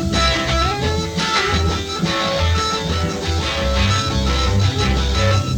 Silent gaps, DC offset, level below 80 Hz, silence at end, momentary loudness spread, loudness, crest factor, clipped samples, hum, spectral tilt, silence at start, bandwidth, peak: none; under 0.1%; -24 dBFS; 0 s; 4 LU; -18 LUFS; 14 dB; under 0.1%; none; -4.5 dB/octave; 0 s; 18 kHz; -4 dBFS